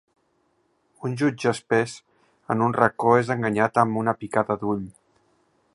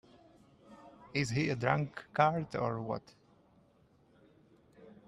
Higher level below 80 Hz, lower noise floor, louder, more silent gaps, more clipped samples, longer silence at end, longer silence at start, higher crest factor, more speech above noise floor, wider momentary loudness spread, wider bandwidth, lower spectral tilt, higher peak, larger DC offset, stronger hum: first, -62 dBFS vs -68 dBFS; about the same, -68 dBFS vs -67 dBFS; first, -23 LUFS vs -34 LUFS; neither; neither; first, 0.85 s vs 0.15 s; first, 1 s vs 0.7 s; about the same, 24 dB vs 26 dB; first, 46 dB vs 34 dB; about the same, 11 LU vs 12 LU; about the same, 11.5 kHz vs 11.5 kHz; about the same, -6.5 dB/octave vs -6 dB/octave; first, -2 dBFS vs -12 dBFS; neither; neither